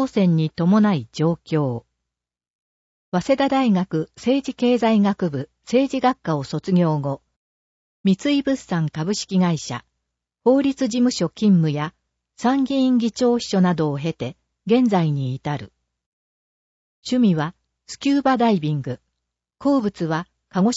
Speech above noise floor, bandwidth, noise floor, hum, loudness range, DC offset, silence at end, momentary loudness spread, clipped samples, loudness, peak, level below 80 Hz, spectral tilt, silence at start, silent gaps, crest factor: 67 dB; 8 kHz; -86 dBFS; none; 3 LU; under 0.1%; 0 s; 11 LU; under 0.1%; -21 LUFS; -6 dBFS; -58 dBFS; -6.5 dB/octave; 0 s; 2.50-3.12 s, 7.36-8.04 s, 16.06-17.02 s; 16 dB